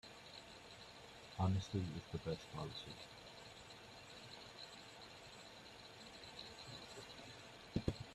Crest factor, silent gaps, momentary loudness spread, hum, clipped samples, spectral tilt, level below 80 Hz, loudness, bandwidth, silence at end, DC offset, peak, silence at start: 26 dB; none; 14 LU; none; under 0.1%; -5.5 dB/octave; -66 dBFS; -49 LUFS; 13 kHz; 0 s; under 0.1%; -24 dBFS; 0.05 s